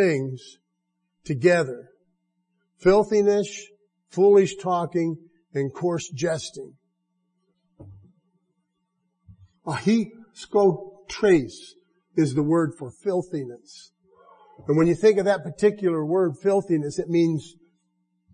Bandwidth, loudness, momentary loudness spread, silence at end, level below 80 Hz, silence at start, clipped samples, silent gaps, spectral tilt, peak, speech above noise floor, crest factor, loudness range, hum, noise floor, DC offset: 10 kHz; -23 LUFS; 18 LU; 0.85 s; -58 dBFS; 0 s; under 0.1%; none; -6.5 dB/octave; -6 dBFS; 55 dB; 18 dB; 9 LU; none; -77 dBFS; under 0.1%